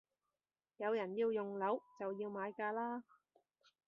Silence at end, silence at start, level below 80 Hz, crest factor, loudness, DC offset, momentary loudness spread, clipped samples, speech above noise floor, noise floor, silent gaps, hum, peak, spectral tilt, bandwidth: 0.85 s; 0.8 s; under -90 dBFS; 18 dB; -41 LUFS; under 0.1%; 6 LU; under 0.1%; over 49 dB; under -90 dBFS; none; none; -24 dBFS; -4.5 dB/octave; 6 kHz